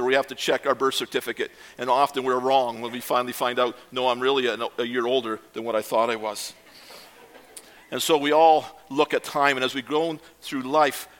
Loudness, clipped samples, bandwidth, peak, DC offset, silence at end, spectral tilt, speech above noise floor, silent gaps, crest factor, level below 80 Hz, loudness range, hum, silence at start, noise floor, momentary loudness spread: -24 LUFS; under 0.1%; 17.5 kHz; -4 dBFS; under 0.1%; 0.15 s; -3 dB/octave; 25 dB; none; 20 dB; -70 dBFS; 5 LU; none; 0 s; -49 dBFS; 12 LU